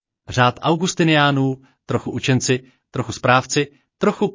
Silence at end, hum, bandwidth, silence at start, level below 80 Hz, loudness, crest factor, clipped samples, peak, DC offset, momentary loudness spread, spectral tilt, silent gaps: 0 s; none; 7.8 kHz; 0.3 s; -50 dBFS; -19 LUFS; 16 dB; under 0.1%; -2 dBFS; under 0.1%; 12 LU; -5 dB/octave; none